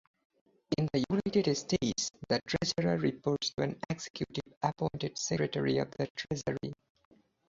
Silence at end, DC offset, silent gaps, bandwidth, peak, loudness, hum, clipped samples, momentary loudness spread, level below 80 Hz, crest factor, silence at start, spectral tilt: 0.75 s; under 0.1%; 4.10-4.14 s, 4.57-4.61 s, 6.10-6.15 s; 8 kHz; -14 dBFS; -33 LUFS; none; under 0.1%; 8 LU; -60 dBFS; 18 dB; 0.7 s; -5 dB/octave